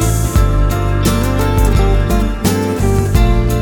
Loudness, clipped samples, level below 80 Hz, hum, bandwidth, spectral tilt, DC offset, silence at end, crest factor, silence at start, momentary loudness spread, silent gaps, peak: -14 LUFS; under 0.1%; -16 dBFS; none; 19.5 kHz; -6 dB/octave; under 0.1%; 0 s; 12 dB; 0 s; 2 LU; none; 0 dBFS